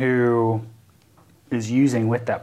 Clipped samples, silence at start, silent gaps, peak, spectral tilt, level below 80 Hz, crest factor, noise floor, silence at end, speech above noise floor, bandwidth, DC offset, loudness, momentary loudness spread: under 0.1%; 0 s; none; -8 dBFS; -7.5 dB/octave; -66 dBFS; 14 dB; -55 dBFS; 0 s; 35 dB; 12.5 kHz; under 0.1%; -21 LUFS; 10 LU